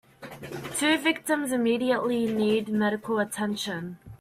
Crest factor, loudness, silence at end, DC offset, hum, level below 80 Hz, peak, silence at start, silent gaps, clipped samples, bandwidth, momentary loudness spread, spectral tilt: 16 dB; -26 LUFS; 0.05 s; under 0.1%; none; -64 dBFS; -10 dBFS; 0.2 s; none; under 0.1%; 15.5 kHz; 14 LU; -4 dB/octave